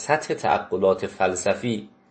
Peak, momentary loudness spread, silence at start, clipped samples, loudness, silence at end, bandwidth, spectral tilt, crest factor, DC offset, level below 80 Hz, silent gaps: -6 dBFS; 5 LU; 0 s; under 0.1%; -24 LUFS; 0.25 s; 8.8 kHz; -4.5 dB/octave; 18 dB; under 0.1%; -60 dBFS; none